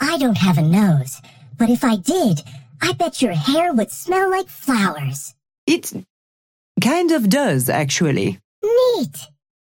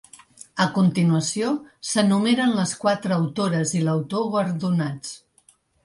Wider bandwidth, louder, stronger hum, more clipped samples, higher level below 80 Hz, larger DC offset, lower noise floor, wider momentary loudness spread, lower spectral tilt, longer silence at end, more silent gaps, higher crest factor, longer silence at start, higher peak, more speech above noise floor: first, 17 kHz vs 11.5 kHz; first, -18 LUFS vs -22 LUFS; neither; neither; first, -56 dBFS vs -64 dBFS; neither; first, under -90 dBFS vs -60 dBFS; first, 12 LU vs 9 LU; about the same, -5.5 dB/octave vs -5.5 dB/octave; second, 0.4 s vs 0.65 s; first, 5.58-5.67 s, 6.10-6.75 s, 8.44-8.62 s vs none; about the same, 14 dB vs 18 dB; second, 0 s vs 0.55 s; about the same, -4 dBFS vs -6 dBFS; first, over 72 dB vs 38 dB